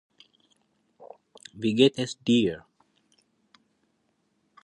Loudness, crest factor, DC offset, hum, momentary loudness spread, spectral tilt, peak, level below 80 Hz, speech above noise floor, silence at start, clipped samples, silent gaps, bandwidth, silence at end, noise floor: -24 LUFS; 24 dB; under 0.1%; none; 24 LU; -5.5 dB/octave; -6 dBFS; -66 dBFS; 49 dB; 1 s; under 0.1%; none; 10.5 kHz; 2.05 s; -72 dBFS